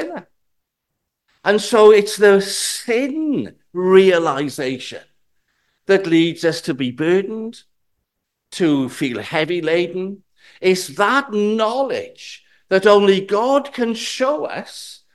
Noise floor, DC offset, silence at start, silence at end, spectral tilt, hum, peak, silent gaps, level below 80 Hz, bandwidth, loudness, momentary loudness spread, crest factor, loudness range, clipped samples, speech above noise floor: -77 dBFS; 0.1%; 0 s; 0.2 s; -4.5 dB/octave; none; 0 dBFS; none; -66 dBFS; 12.5 kHz; -17 LUFS; 17 LU; 18 dB; 6 LU; under 0.1%; 60 dB